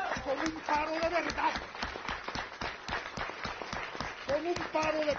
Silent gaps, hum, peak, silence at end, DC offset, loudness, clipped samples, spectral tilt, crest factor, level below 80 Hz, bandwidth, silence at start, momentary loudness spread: none; none; -16 dBFS; 0 s; under 0.1%; -34 LUFS; under 0.1%; -2 dB/octave; 18 dB; -54 dBFS; 7.2 kHz; 0 s; 8 LU